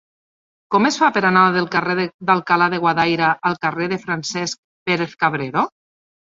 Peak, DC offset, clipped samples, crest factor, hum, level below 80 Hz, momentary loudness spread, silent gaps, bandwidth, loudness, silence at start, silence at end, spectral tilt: -2 dBFS; under 0.1%; under 0.1%; 18 dB; none; -62 dBFS; 9 LU; 2.14-2.19 s, 4.58-4.86 s; 7.8 kHz; -18 LUFS; 0.7 s; 0.65 s; -4.5 dB/octave